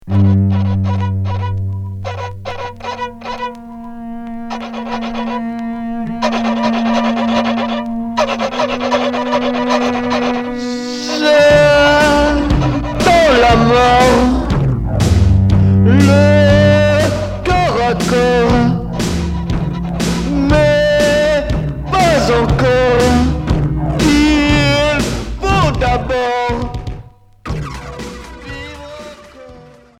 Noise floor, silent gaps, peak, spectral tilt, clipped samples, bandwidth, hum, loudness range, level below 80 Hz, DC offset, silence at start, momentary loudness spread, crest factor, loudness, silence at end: -39 dBFS; none; 0 dBFS; -6 dB/octave; under 0.1%; 14 kHz; none; 12 LU; -26 dBFS; under 0.1%; 0.05 s; 16 LU; 14 dB; -13 LUFS; 0.35 s